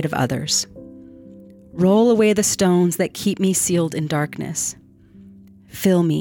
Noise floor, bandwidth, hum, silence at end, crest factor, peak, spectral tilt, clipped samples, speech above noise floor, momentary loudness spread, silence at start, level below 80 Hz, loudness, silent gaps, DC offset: -46 dBFS; 19 kHz; none; 0 s; 14 dB; -4 dBFS; -4.5 dB/octave; under 0.1%; 28 dB; 9 LU; 0 s; -56 dBFS; -19 LUFS; none; under 0.1%